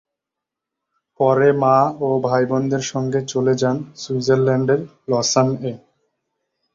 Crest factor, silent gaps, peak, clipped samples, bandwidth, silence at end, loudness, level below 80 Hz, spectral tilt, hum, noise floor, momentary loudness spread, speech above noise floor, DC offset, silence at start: 18 dB; none; -2 dBFS; under 0.1%; 7.6 kHz; 0.95 s; -18 LUFS; -58 dBFS; -5.5 dB/octave; none; -84 dBFS; 8 LU; 66 dB; under 0.1%; 1.2 s